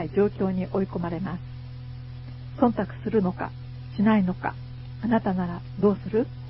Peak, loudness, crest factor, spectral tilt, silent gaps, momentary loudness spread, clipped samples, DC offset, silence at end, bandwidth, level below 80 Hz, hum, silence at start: -6 dBFS; -26 LUFS; 22 dB; -7.5 dB/octave; none; 16 LU; under 0.1%; under 0.1%; 0 s; 5.8 kHz; -48 dBFS; none; 0 s